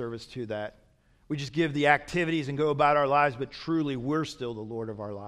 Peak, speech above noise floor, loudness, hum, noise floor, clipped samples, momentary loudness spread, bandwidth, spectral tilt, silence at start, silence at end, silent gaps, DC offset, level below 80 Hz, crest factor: -6 dBFS; 35 dB; -28 LUFS; none; -63 dBFS; under 0.1%; 13 LU; 12.5 kHz; -6 dB/octave; 0 s; 0 s; none; under 0.1%; -60 dBFS; 22 dB